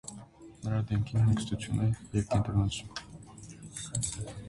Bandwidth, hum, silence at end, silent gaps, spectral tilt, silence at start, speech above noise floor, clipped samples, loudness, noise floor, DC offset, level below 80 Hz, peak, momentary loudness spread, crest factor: 11.5 kHz; none; 0 s; none; -5.5 dB/octave; 0.05 s; 20 dB; under 0.1%; -31 LUFS; -50 dBFS; under 0.1%; -48 dBFS; -16 dBFS; 20 LU; 16 dB